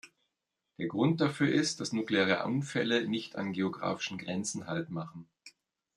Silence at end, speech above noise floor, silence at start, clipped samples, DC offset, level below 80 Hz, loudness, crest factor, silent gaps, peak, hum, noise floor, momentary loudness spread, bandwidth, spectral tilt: 0.45 s; 54 dB; 0.05 s; under 0.1%; under 0.1%; -76 dBFS; -32 LUFS; 22 dB; none; -12 dBFS; none; -85 dBFS; 10 LU; 12 kHz; -5 dB/octave